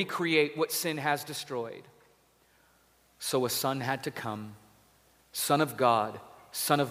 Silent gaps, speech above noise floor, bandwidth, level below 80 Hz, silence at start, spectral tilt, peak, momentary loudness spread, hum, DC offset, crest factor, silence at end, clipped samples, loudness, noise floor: none; 36 dB; 16 kHz; -74 dBFS; 0 s; -3.5 dB/octave; -10 dBFS; 14 LU; none; under 0.1%; 22 dB; 0 s; under 0.1%; -30 LUFS; -65 dBFS